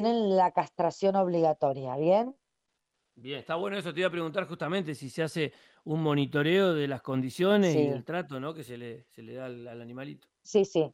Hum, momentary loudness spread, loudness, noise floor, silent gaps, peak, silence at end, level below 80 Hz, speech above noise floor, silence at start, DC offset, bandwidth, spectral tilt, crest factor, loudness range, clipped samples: none; 18 LU; -29 LUFS; -82 dBFS; none; -12 dBFS; 0.05 s; -76 dBFS; 53 dB; 0 s; under 0.1%; 16 kHz; -6.5 dB/octave; 18 dB; 5 LU; under 0.1%